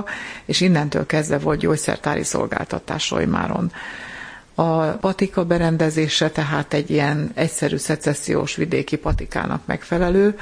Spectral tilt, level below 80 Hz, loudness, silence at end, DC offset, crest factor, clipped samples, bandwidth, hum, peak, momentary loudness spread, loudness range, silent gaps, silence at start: -5 dB/octave; -38 dBFS; -21 LUFS; 0 s; under 0.1%; 18 dB; under 0.1%; 10.5 kHz; none; -2 dBFS; 8 LU; 3 LU; none; 0 s